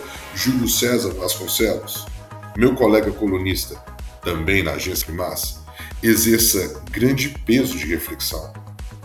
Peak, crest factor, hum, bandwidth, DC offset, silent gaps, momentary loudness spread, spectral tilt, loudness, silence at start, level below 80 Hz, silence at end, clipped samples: -2 dBFS; 20 dB; none; 19.5 kHz; under 0.1%; none; 18 LU; -4 dB/octave; -20 LUFS; 0 s; -36 dBFS; 0 s; under 0.1%